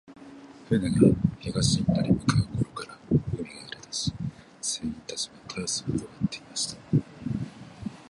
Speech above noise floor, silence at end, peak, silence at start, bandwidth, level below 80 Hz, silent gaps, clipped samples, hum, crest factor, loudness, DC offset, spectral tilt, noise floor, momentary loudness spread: 23 dB; 0.1 s; -6 dBFS; 0.1 s; 11.5 kHz; -48 dBFS; none; under 0.1%; none; 22 dB; -28 LUFS; under 0.1%; -5 dB/octave; -47 dBFS; 17 LU